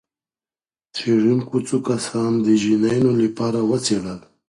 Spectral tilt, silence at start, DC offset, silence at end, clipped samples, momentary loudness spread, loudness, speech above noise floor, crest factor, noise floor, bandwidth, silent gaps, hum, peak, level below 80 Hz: -6 dB/octave; 0.95 s; under 0.1%; 0.3 s; under 0.1%; 7 LU; -19 LUFS; over 71 dB; 14 dB; under -90 dBFS; 11.5 kHz; none; none; -6 dBFS; -58 dBFS